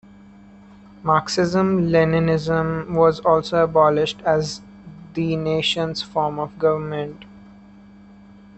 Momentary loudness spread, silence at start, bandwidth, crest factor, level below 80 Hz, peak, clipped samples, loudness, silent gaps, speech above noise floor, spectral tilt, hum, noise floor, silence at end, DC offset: 11 LU; 1.05 s; 8.4 kHz; 18 dB; -50 dBFS; -4 dBFS; under 0.1%; -20 LUFS; none; 26 dB; -6 dB/octave; none; -46 dBFS; 1.15 s; under 0.1%